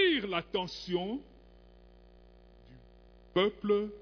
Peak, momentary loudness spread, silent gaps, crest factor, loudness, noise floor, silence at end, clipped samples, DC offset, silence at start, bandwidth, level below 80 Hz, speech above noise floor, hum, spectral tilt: -16 dBFS; 8 LU; none; 18 dB; -33 LUFS; -57 dBFS; 0 s; under 0.1%; under 0.1%; 0 s; 5.4 kHz; -58 dBFS; 25 dB; 60 Hz at -65 dBFS; -6 dB/octave